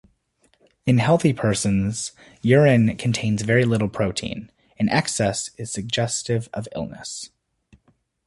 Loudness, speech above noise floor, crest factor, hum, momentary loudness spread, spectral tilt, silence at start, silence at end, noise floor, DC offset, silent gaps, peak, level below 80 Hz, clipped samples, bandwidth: -22 LUFS; 43 dB; 20 dB; none; 15 LU; -5.5 dB/octave; 0.85 s; 1 s; -64 dBFS; under 0.1%; none; -2 dBFS; -50 dBFS; under 0.1%; 11.5 kHz